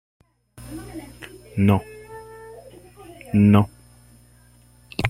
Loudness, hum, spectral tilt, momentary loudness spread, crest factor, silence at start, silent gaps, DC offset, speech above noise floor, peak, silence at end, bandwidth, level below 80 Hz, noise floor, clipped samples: -20 LUFS; 60 Hz at -50 dBFS; -8 dB/octave; 27 LU; 22 dB; 0.6 s; none; under 0.1%; 34 dB; -2 dBFS; 0 s; 15 kHz; -48 dBFS; -53 dBFS; under 0.1%